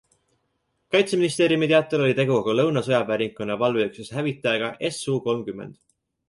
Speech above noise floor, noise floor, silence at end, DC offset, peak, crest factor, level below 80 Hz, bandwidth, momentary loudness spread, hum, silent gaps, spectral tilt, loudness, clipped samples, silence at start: 51 dB; -73 dBFS; 0.55 s; under 0.1%; -6 dBFS; 18 dB; -64 dBFS; 11.5 kHz; 9 LU; none; none; -5.5 dB/octave; -23 LUFS; under 0.1%; 0.9 s